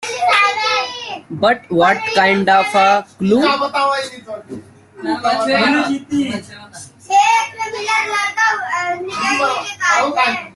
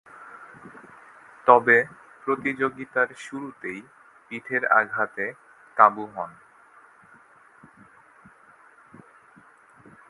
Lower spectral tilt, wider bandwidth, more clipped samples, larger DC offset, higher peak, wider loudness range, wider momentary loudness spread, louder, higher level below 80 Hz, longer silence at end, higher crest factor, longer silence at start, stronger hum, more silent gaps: second, -3.5 dB/octave vs -6 dB/octave; about the same, 12.5 kHz vs 11.5 kHz; neither; neither; about the same, -2 dBFS vs 0 dBFS; about the same, 4 LU vs 4 LU; second, 15 LU vs 26 LU; first, -15 LUFS vs -23 LUFS; first, -60 dBFS vs -74 dBFS; second, 0.05 s vs 3.8 s; second, 16 dB vs 26 dB; second, 0 s vs 0.2 s; neither; neither